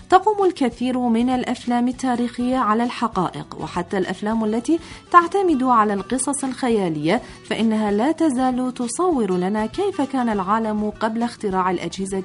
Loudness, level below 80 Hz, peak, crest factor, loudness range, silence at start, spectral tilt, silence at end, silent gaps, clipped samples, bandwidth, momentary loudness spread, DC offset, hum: -21 LUFS; -50 dBFS; 0 dBFS; 20 dB; 3 LU; 0 s; -5 dB/octave; 0 s; none; under 0.1%; 11 kHz; 7 LU; under 0.1%; none